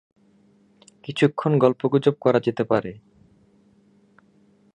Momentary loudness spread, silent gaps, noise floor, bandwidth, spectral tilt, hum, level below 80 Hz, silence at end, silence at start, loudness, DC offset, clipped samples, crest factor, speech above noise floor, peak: 13 LU; none; -58 dBFS; 9.6 kHz; -7.5 dB/octave; none; -64 dBFS; 1.75 s; 1.1 s; -21 LUFS; under 0.1%; under 0.1%; 22 dB; 38 dB; -2 dBFS